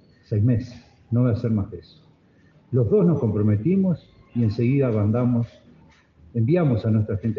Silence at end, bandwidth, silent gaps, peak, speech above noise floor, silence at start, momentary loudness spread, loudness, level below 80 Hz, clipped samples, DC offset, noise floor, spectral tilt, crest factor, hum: 0 s; 5.8 kHz; none; -8 dBFS; 35 dB; 0.3 s; 11 LU; -22 LUFS; -56 dBFS; under 0.1%; under 0.1%; -56 dBFS; -11 dB/octave; 14 dB; none